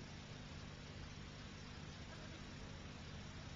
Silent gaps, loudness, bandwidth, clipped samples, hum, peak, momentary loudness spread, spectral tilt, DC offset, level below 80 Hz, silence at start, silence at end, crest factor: none; -53 LUFS; 7.4 kHz; under 0.1%; 50 Hz at -60 dBFS; -40 dBFS; 1 LU; -4.5 dB/octave; under 0.1%; -60 dBFS; 0 s; 0 s; 12 dB